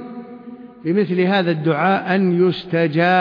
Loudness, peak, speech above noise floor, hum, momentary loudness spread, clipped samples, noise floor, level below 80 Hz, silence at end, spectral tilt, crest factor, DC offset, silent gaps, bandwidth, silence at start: -18 LUFS; -4 dBFS; 20 dB; none; 19 LU; under 0.1%; -37 dBFS; -64 dBFS; 0 s; -9 dB/octave; 14 dB; under 0.1%; none; 5.2 kHz; 0 s